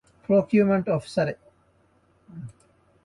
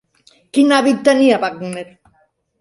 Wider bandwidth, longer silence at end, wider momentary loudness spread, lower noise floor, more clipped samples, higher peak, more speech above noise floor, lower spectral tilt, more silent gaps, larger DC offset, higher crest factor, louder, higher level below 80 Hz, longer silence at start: about the same, 11.5 kHz vs 11.5 kHz; second, 0.55 s vs 0.75 s; first, 22 LU vs 15 LU; about the same, -63 dBFS vs -60 dBFS; neither; second, -10 dBFS vs 0 dBFS; second, 41 dB vs 46 dB; first, -8 dB/octave vs -4.5 dB/octave; neither; neither; about the same, 16 dB vs 16 dB; second, -23 LUFS vs -14 LUFS; about the same, -62 dBFS vs -64 dBFS; second, 0.3 s vs 0.55 s